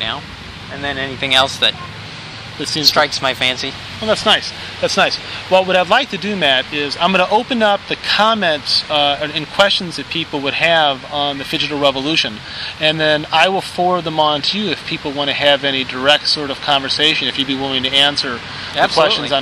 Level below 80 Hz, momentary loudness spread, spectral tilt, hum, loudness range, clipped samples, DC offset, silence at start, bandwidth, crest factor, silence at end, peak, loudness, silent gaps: -48 dBFS; 10 LU; -3 dB/octave; none; 2 LU; under 0.1%; under 0.1%; 0 s; 15 kHz; 16 dB; 0 s; 0 dBFS; -15 LUFS; none